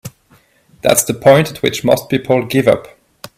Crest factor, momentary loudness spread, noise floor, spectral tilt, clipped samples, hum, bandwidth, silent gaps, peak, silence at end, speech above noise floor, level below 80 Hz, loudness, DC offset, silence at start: 14 dB; 7 LU; -52 dBFS; -4.5 dB/octave; under 0.1%; none; 16 kHz; none; 0 dBFS; 0.5 s; 39 dB; -50 dBFS; -13 LUFS; under 0.1%; 0.05 s